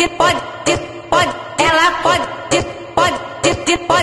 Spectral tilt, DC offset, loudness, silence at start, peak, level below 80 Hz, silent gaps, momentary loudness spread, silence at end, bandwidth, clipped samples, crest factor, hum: -3 dB/octave; under 0.1%; -16 LUFS; 0 s; 0 dBFS; -40 dBFS; none; 6 LU; 0 s; 12.5 kHz; under 0.1%; 16 dB; none